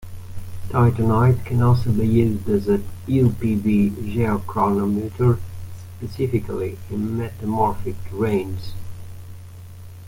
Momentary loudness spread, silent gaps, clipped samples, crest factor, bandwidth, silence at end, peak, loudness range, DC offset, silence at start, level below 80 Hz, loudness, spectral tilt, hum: 20 LU; none; under 0.1%; 16 dB; 16.5 kHz; 0 s; -4 dBFS; 6 LU; under 0.1%; 0 s; -40 dBFS; -21 LUFS; -9 dB/octave; none